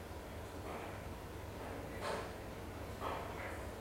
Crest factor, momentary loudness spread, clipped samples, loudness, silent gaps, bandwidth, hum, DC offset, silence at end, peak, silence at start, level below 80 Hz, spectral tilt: 18 dB; 6 LU; under 0.1%; -46 LUFS; none; 16 kHz; none; under 0.1%; 0 s; -28 dBFS; 0 s; -54 dBFS; -5 dB/octave